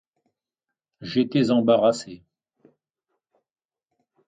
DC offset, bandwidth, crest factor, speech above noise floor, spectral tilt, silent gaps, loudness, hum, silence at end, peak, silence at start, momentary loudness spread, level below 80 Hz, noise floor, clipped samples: under 0.1%; 9.4 kHz; 20 dB; 66 dB; -6.5 dB/octave; none; -21 LUFS; none; 2.1 s; -6 dBFS; 1 s; 19 LU; -68 dBFS; -87 dBFS; under 0.1%